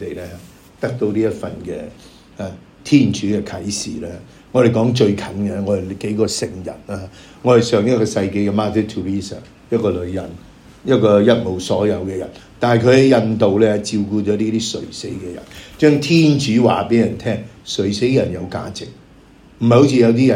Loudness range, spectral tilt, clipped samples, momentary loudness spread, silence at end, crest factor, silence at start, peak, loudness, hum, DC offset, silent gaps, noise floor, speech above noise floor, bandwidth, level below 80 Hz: 5 LU; -6 dB/octave; under 0.1%; 18 LU; 0 s; 16 dB; 0 s; 0 dBFS; -17 LUFS; none; under 0.1%; none; -45 dBFS; 29 dB; 15.5 kHz; -48 dBFS